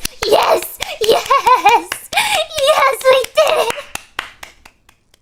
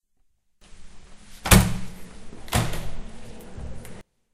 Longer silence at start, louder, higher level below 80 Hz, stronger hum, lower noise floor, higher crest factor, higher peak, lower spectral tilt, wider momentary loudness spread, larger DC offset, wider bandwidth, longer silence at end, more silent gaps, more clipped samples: second, 0 s vs 0.7 s; first, -13 LUFS vs -22 LUFS; second, -44 dBFS vs -32 dBFS; neither; second, -52 dBFS vs -65 dBFS; second, 16 dB vs 26 dB; about the same, 0 dBFS vs 0 dBFS; second, -1 dB/octave vs -4 dB/octave; second, 15 LU vs 27 LU; neither; first, 18 kHz vs 16 kHz; first, 0.9 s vs 0.35 s; neither; neither